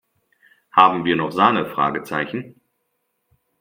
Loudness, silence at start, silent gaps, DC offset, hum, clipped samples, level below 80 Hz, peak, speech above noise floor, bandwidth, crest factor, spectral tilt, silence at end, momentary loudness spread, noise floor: -18 LUFS; 0.75 s; none; under 0.1%; none; under 0.1%; -62 dBFS; 0 dBFS; 54 dB; 16.5 kHz; 22 dB; -6 dB/octave; 1.1 s; 10 LU; -73 dBFS